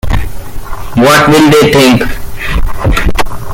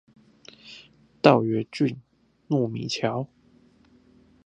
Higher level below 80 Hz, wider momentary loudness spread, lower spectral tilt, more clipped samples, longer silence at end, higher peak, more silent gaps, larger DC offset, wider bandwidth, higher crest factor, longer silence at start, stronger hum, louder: first, -16 dBFS vs -66 dBFS; second, 19 LU vs 26 LU; second, -5 dB/octave vs -6.5 dB/octave; first, 0.3% vs under 0.1%; second, 0 s vs 1.2 s; about the same, 0 dBFS vs 0 dBFS; neither; neither; first, 17 kHz vs 10 kHz; second, 8 dB vs 26 dB; second, 0.05 s vs 0.65 s; neither; first, -8 LUFS vs -24 LUFS